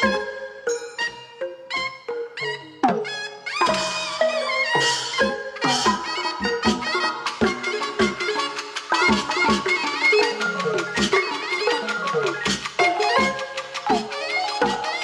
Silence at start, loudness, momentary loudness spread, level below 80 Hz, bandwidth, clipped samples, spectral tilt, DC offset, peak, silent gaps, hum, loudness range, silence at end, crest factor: 0 s; -22 LUFS; 9 LU; -52 dBFS; 13 kHz; under 0.1%; -3 dB/octave; under 0.1%; -6 dBFS; none; none; 5 LU; 0 s; 16 dB